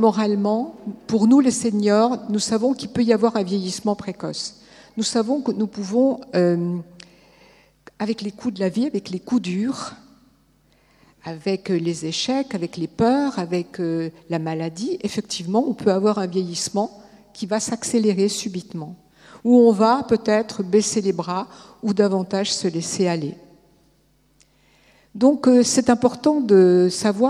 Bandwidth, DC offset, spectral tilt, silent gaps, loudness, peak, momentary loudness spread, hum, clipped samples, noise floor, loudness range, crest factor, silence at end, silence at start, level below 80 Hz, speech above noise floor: 13 kHz; under 0.1%; -5 dB/octave; none; -21 LUFS; -2 dBFS; 13 LU; none; under 0.1%; -60 dBFS; 7 LU; 20 dB; 0 s; 0 s; -60 dBFS; 40 dB